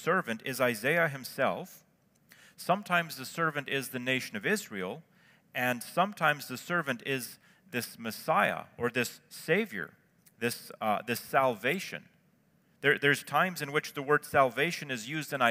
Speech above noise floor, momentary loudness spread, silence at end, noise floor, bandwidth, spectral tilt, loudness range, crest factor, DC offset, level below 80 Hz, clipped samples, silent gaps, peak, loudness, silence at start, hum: 37 dB; 11 LU; 0 s; -68 dBFS; 16 kHz; -4 dB/octave; 3 LU; 22 dB; under 0.1%; -78 dBFS; under 0.1%; none; -10 dBFS; -31 LUFS; 0 s; none